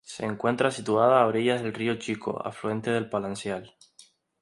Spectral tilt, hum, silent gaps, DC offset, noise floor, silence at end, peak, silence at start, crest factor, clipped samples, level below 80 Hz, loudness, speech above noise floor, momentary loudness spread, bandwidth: -5.5 dB/octave; none; none; under 0.1%; -58 dBFS; 0.75 s; -8 dBFS; 0.1 s; 20 dB; under 0.1%; -66 dBFS; -27 LUFS; 31 dB; 12 LU; 11.5 kHz